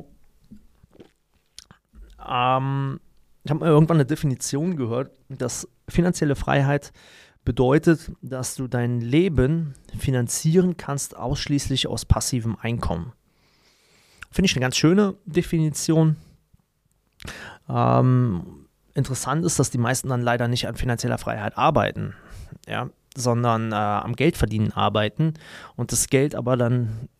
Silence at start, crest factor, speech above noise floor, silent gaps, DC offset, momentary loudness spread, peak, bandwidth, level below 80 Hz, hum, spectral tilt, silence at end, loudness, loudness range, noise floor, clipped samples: 0.5 s; 22 dB; 46 dB; none; under 0.1%; 13 LU; -2 dBFS; 15.5 kHz; -40 dBFS; none; -5.5 dB/octave; 0.15 s; -23 LUFS; 3 LU; -68 dBFS; under 0.1%